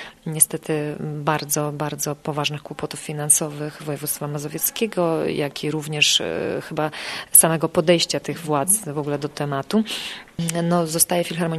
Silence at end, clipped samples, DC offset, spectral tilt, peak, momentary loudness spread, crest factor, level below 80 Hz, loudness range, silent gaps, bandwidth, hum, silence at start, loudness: 0 s; under 0.1%; under 0.1%; -3 dB/octave; 0 dBFS; 12 LU; 22 dB; -58 dBFS; 5 LU; none; 13 kHz; none; 0 s; -21 LUFS